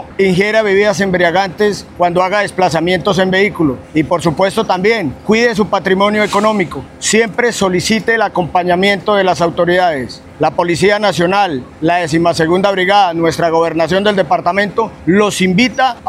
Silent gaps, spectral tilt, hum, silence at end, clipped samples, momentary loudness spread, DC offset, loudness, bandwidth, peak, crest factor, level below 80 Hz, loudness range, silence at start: none; -4.5 dB/octave; none; 0 s; under 0.1%; 5 LU; under 0.1%; -13 LUFS; 15 kHz; 0 dBFS; 12 dB; -44 dBFS; 1 LU; 0 s